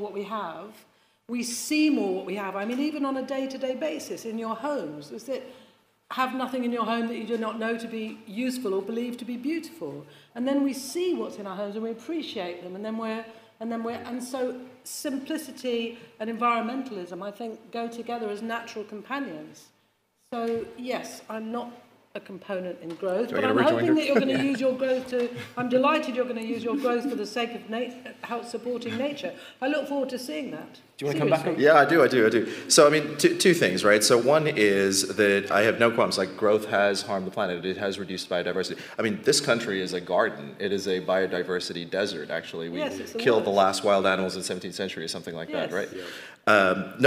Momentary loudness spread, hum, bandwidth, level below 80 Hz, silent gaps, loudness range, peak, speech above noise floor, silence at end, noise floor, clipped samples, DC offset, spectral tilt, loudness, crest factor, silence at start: 15 LU; none; 16 kHz; -76 dBFS; none; 12 LU; -4 dBFS; 42 dB; 0 s; -68 dBFS; under 0.1%; under 0.1%; -4 dB/octave; -26 LUFS; 22 dB; 0 s